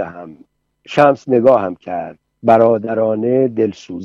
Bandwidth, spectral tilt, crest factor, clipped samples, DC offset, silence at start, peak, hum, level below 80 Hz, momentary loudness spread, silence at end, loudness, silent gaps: 7.4 kHz; -7.5 dB/octave; 16 dB; under 0.1%; under 0.1%; 0 s; 0 dBFS; none; -60 dBFS; 14 LU; 0 s; -15 LUFS; none